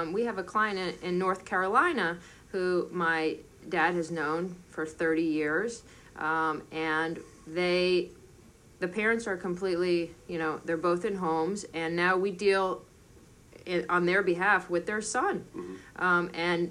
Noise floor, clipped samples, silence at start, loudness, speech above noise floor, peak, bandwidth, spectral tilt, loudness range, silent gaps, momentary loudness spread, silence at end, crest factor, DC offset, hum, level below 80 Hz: -55 dBFS; under 0.1%; 0 s; -29 LUFS; 26 dB; -10 dBFS; 11.5 kHz; -5 dB/octave; 3 LU; none; 12 LU; 0 s; 20 dB; under 0.1%; none; -62 dBFS